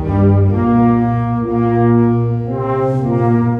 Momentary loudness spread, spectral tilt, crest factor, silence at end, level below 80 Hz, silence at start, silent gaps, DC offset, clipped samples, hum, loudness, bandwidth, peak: 5 LU; -11.5 dB/octave; 12 dB; 0 s; -36 dBFS; 0 s; none; under 0.1%; under 0.1%; none; -14 LUFS; 3.7 kHz; -2 dBFS